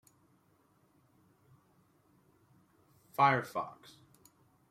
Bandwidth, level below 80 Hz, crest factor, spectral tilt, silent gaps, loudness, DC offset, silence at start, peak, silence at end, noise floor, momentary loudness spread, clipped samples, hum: 16 kHz; -80 dBFS; 26 dB; -5.5 dB/octave; none; -32 LUFS; under 0.1%; 3.2 s; -14 dBFS; 1 s; -70 dBFS; 19 LU; under 0.1%; none